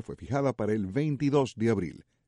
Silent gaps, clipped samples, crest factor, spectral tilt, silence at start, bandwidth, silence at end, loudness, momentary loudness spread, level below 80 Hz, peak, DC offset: none; under 0.1%; 16 dB; -7.5 dB/octave; 0.1 s; 11 kHz; 0.25 s; -29 LUFS; 6 LU; -58 dBFS; -14 dBFS; under 0.1%